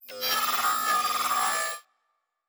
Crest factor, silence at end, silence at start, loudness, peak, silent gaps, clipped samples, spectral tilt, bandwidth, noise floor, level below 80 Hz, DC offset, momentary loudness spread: 14 dB; 0.7 s; 0.05 s; -25 LUFS; -14 dBFS; none; under 0.1%; 1 dB/octave; over 20 kHz; -77 dBFS; -72 dBFS; under 0.1%; 6 LU